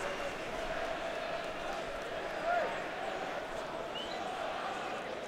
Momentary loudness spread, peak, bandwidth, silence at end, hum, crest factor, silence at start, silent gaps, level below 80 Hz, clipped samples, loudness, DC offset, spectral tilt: 5 LU; -22 dBFS; 16 kHz; 0 s; none; 16 dB; 0 s; none; -56 dBFS; under 0.1%; -38 LUFS; under 0.1%; -3.5 dB/octave